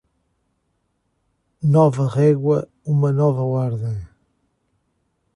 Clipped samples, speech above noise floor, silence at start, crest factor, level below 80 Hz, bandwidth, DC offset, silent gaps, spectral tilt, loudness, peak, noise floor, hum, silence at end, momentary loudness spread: under 0.1%; 53 dB; 1.6 s; 18 dB; -52 dBFS; 10.5 kHz; under 0.1%; none; -10 dB/octave; -19 LUFS; -4 dBFS; -70 dBFS; none; 1.3 s; 10 LU